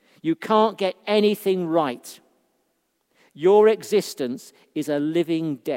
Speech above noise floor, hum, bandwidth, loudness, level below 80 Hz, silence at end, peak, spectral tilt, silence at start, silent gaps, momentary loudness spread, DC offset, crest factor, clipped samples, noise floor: 50 dB; none; 16.5 kHz; -22 LUFS; -78 dBFS; 0 s; -6 dBFS; -5.5 dB/octave; 0.25 s; none; 14 LU; under 0.1%; 18 dB; under 0.1%; -72 dBFS